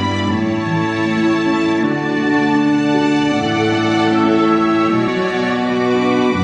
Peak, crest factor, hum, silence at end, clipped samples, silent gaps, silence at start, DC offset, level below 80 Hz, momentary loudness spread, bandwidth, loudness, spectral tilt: -4 dBFS; 12 dB; none; 0 s; under 0.1%; none; 0 s; under 0.1%; -52 dBFS; 4 LU; 9.2 kHz; -15 LUFS; -6 dB/octave